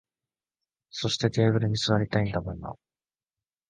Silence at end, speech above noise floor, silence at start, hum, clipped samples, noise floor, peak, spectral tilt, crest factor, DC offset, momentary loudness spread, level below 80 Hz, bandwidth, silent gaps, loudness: 0.95 s; over 64 dB; 0.95 s; none; under 0.1%; under -90 dBFS; -8 dBFS; -5.5 dB/octave; 20 dB; under 0.1%; 15 LU; -52 dBFS; 9.4 kHz; none; -26 LUFS